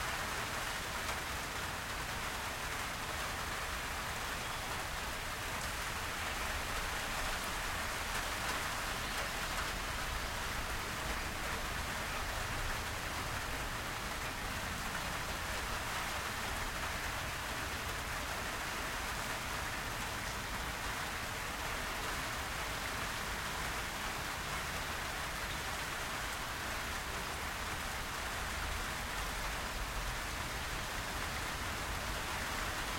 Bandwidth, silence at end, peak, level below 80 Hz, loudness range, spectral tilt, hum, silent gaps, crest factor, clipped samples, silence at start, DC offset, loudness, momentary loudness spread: 16.5 kHz; 0 s; -24 dBFS; -48 dBFS; 1 LU; -2.5 dB/octave; none; none; 16 dB; under 0.1%; 0 s; under 0.1%; -38 LUFS; 2 LU